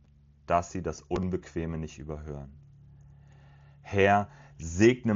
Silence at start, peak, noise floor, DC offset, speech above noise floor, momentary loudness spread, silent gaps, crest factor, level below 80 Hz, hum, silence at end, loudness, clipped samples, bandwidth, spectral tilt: 0.5 s; -8 dBFS; -54 dBFS; under 0.1%; 26 dB; 18 LU; none; 22 dB; -52 dBFS; none; 0 s; -29 LUFS; under 0.1%; 7.6 kHz; -6 dB/octave